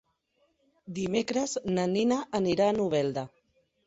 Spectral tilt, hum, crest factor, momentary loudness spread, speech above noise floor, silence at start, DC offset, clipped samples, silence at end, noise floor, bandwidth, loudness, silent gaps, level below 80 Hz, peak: -5.5 dB/octave; none; 18 dB; 10 LU; 45 dB; 0.85 s; under 0.1%; under 0.1%; 0.6 s; -72 dBFS; 8.2 kHz; -28 LUFS; none; -64 dBFS; -12 dBFS